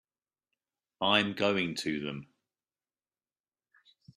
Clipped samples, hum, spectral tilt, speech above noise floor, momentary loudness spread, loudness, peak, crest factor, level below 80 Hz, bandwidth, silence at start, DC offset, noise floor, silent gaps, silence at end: under 0.1%; none; -4.5 dB/octave; over 60 dB; 12 LU; -30 LUFS; -10 dBFS; 26 dB; -72 dBFS; 13.5 kHz; 1 s; under 0.1%; under -90 dBFS; none; 1.9 s